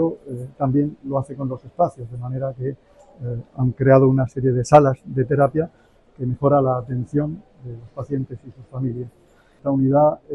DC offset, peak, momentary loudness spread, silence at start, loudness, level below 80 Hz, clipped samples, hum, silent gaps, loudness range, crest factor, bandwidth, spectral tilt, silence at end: under 0.1%; 0 dBFS; 19 LU; 0 s; -20 LUFS; -50 dBFS; under 0.1%; none; none; 7 LU; 20 dB; 9.8 kHz; -9 dB/octave; 0 s